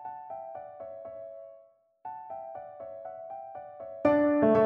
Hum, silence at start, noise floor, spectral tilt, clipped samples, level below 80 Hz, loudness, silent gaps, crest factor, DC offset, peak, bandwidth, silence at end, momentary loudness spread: none; 0 s; -60 dBFS; -9.5 dB/octave; under 0.1%; -66 dBFS; -32 LUFS; none; 20 dB; under 0.1%; -12 dBFS; 5.6 kHz; 0 s; 20 LU